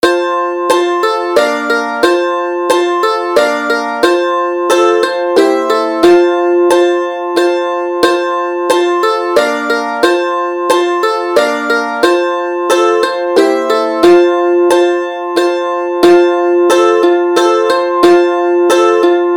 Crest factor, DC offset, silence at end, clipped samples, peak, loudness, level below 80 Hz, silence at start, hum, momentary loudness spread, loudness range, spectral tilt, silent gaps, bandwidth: 10 dB; under 0.1%; 0 s; 0.2%; 0 dBFS; -11 LUFS; -54 dBFS; 0.05 s; none; 6 LU; 3 LU; -3 dB/octave; none; 17 kHz